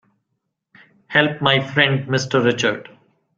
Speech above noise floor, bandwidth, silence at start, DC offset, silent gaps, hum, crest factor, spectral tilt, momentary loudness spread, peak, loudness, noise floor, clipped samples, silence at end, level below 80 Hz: 57 dB; 7.6 kHz; 1.1 s; under 0.1%; none; none; 20 dB; -5 dB/octave; 5 LU; 0 dBFS; -18 LUFS; -75 dBFS; under 0.1%; 0.55 s; -58 dBFS